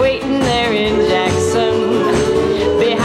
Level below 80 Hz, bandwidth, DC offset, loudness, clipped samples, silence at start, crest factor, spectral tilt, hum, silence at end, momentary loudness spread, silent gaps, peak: -36 dBFS; 13 kHz; under 0.1%; -15 LUFS; under 0.1%; 0 s; 10 dB; -5 dB/octave; none; 0 s; 1 LU; none; -4 dBFS